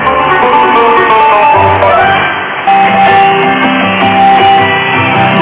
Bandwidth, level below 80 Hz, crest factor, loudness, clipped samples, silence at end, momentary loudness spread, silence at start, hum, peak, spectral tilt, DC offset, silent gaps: 4 kHz; -36 dBFS; 6 dB; -6 LUFS; 1%; 0 s; 3 LU; 0 s; none; 0 dBFS; -8.5 dB/octave; under 0.1%; none